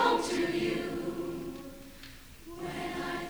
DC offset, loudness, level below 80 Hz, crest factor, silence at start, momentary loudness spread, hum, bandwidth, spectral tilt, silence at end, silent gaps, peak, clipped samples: under 0.1%; -34 LUFS; -54 dBFS; 20 dB; 0 s; 19 LU; none; over 20 kHz; -4.5 dB/octave; 0 s; none; -14 dBFS; under 0.1%